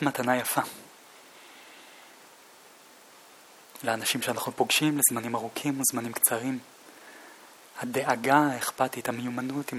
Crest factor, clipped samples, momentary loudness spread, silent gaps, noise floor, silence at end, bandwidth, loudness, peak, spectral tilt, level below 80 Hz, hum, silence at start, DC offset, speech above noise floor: 24 dB; under 0.1%; 25 LU; none; -53 dBFS; 0 s; 17 kHz; -27 LUFS; -6 dBFS; -3 dB/octave; -76 dBFS; none; 0 s; under 0.1%; 26 dB